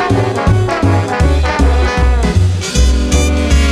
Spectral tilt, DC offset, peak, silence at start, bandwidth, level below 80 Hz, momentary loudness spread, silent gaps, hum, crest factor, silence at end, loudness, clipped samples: -5.5 dB/octave; under 0.1%; 0 dBFS; 0 s; 12.5 kHz; -14 dBFS; 1 LU; none; none; 10 dB; 0 s; -13 LUFS; under 0.1%